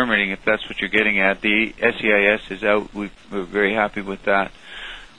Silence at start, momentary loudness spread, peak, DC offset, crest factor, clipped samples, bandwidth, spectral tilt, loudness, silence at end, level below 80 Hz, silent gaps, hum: 0 s; 14 LU; 0 dBFS; 0.4%; 20 dB; under 0.1%; 10.5 kHz; -5.5 dB/octave; -19 LUFS; 0.15 s; -46 dBFS; none; none